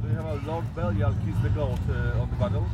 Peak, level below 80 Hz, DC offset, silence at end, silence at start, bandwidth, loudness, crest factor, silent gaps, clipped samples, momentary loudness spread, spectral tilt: -12 dBFS; -34 dBFS; under 0.1%; 0 s; 0 s; 8 kHz; -28 LUFS; 14 dB; none; under 0.1%; 4 LU; -8.5 dB/octave